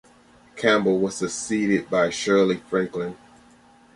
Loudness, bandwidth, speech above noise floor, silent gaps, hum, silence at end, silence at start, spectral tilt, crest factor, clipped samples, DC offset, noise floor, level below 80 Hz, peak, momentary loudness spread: -23 LUFS; 11.5 kHz; 31 dB; none; none; 0.8 s; 0.55 s; -4.5 dB/octave; 18 dB; under 0.1%; under 0.1%; -53 dBFS; -60 dBFS; -6 dBFS; 8 LU